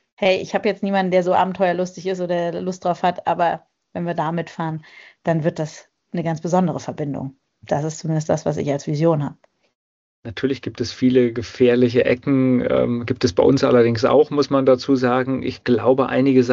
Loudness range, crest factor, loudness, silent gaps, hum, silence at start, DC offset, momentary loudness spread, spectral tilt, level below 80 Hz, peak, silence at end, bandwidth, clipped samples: 7 LU; 16 dB; -19 LUFS; 9.75-10.23 s; none; 0.2 s; under 0.1%; 11 LU; -6 dB/octave; -54 dBFS; -4 dBFS; 0 s; 7.6 kHz; under 0.1%